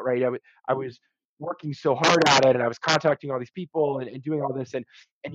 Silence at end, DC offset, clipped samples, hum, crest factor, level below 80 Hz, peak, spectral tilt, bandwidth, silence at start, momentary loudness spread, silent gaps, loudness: 0 s; under 0.1%; under 0.1%; none; 18 dB; -68 dBFS; -6 dBFS; -4 dB/octave; 9.6 kHz; 0 s; 17 LU; 1.25-1.37 s, 5.12-5.21 s; -24 LUFS